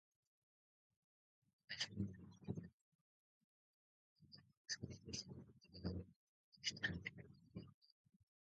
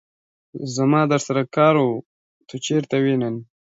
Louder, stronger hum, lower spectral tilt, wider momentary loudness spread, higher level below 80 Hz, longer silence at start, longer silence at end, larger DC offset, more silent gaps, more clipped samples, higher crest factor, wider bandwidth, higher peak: second, -50 LUFS vs -20 LUFS; neither; second, -3.5 dB/octave vs -6 dB/octave; first, 19 LU vs 15 LU; about the same, -68 dBFS vs -68 dBFS; first, 1.7 s vs 0.55 s; first, 0.6 s vs 0.25 s; neither; first, 2.73-4.16 s, 4.57-4.65 s, 6.16-6.52 s, 7.74-7.82 s vs 2.05-2.41 s; neither; first, 24 dB vs 16 dB; about the same, 7.4 kHz vs 8 kHz; second, -30 dBFS vs -4 dBFS